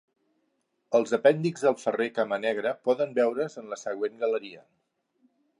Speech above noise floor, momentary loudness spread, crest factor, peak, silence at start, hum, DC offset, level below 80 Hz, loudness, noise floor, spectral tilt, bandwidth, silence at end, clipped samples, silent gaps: 49 dB; 10 LU; 22 dB; -6 dBFS; 0.9 s; none; under 0.1%; -82 dBFS; -27 LUFS; -75 dBFS; -5.5 dB/octave; 11 kHz; 1 s; under 0.1%; none